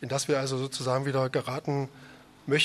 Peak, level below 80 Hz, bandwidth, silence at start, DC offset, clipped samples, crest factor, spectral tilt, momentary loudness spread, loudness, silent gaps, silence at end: -12 dBFS; -68 dBFS; 13 kHz; 0 s; under 0.1%; under 0.1%; 18 dB; -4.5 dB/octave; 6 LU; -30 LUFS; none; 0 s